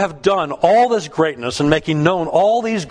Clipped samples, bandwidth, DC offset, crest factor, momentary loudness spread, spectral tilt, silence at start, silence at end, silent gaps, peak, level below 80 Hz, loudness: under 0.1%; 10.5 kHz; under 0.1%; 16 dB; 5 LU; -5.5 dB/octave; 0 s; 0 s; none; 0 dBFS; -46 dBFS; -16 LUFS